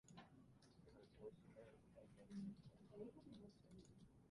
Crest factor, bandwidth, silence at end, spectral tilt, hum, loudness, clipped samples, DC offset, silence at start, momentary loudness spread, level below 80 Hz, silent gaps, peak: 18 dB; 11 kHz; 0 s; -7 dB/octave; none; -62 LUFS; under 0.1%; under 0.1%; 0.05 s; 13 LU; -80 dBFS; none; -44 dBFS